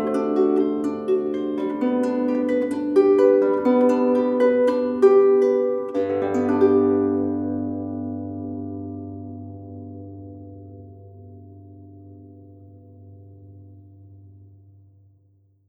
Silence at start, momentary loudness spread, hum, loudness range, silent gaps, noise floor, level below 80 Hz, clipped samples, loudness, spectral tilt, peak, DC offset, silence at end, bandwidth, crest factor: 0 s; 21 LU; none; 20 LU; none; -60 dBFS; -68 dBFS; under 0.1%; -20 LUFS; -8.5 dB/octave; -4 dBFS; under 0.1%; 1.55 s; 7.8 kHz; 18 dB